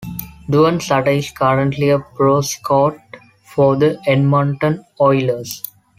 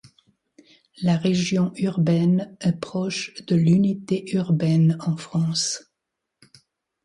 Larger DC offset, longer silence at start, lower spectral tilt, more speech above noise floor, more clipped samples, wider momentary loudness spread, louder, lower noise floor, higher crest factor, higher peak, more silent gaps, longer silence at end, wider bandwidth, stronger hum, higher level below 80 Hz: neither; second, 0 s vs 1 s; about the same, -6 dB/octave vs -6 dB/octave; second, 26 dB vs 61 dB; neither; about the same, 9 LU vs 8 LU; first, -16 LUFS vs -22 LUFS; second, -41 dBFS vs -82 dBFS; about the same, 14 dB vs 14 dB; first, -2 dBFS vs -8 dBFS; neither; second, 0.4 s vs 1.25 s; first, 16 kHz vs 11.5 kHz; neither; first, -48 dBFS vs -62 dBFS